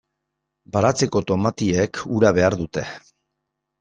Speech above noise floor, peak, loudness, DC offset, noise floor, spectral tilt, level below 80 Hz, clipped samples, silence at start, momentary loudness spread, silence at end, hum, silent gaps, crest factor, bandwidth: 59 dB; -2 dBFS; -20 LUFS; under 0.1%; -79 dBFS; -5.5 dB/octave; -52 dBFS; under 0.1%; 0.75 s; 12 LU; 0.85 s; none; none; 20 dB; 9.6 kHz